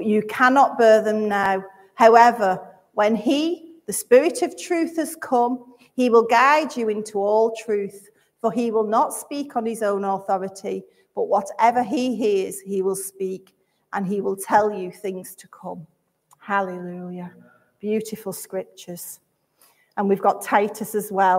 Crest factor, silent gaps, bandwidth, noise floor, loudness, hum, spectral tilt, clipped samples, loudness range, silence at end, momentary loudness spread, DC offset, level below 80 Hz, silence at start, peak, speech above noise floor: 20 dB; none; 16 kHz; -60 dBFS; -21 LUFS; none; -4.5 dB/octave; under 0.1%; 11 LU; 0 s; 18 LU; under 0.1%; -72 dBFS; 0 s; 0 dBFS; 40 dB